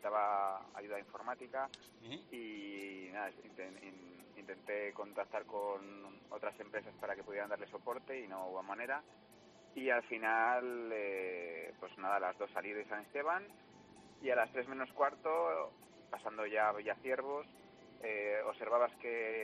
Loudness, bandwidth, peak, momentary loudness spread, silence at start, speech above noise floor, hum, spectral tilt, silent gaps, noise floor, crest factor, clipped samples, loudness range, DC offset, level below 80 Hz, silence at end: -40 LUFS; 13 kHz; -20 dBFS; 16 LU; 0 s; 22 dB; none; -4.5 dB/octave; none; -62 dBFS; 20 dB; under 0.1%; 8 LU; under 0.1%; -84 dBFS; 0 s